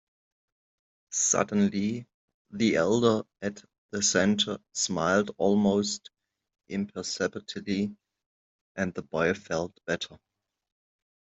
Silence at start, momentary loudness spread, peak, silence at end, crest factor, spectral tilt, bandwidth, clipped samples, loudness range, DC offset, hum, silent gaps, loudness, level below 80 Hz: 1.1 s; 13 LU; -8 dBFS; 1.15 s; 22 dB; -3.5 dB/octave; 8.2 kHz; under 0.1%; 7 LU; under 0.1%; none; 2.14-2.28 s, 2.34-2.45 s, 3.78-3.89 s, 8.26-8.75 s; -28 LUFS; -66 dBFS